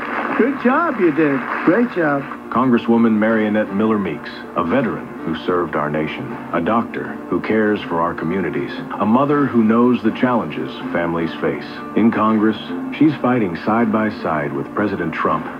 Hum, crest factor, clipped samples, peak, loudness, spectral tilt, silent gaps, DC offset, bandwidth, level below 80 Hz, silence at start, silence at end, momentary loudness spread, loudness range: none; 16 dB; under 0.1%; -2 dBFS; -18 LUFS; -8.5 dB/octave; none; under 0.1%; 5.6 kHz; -54 dBFS; 0 s; 0 s; 9 LU; 4 LU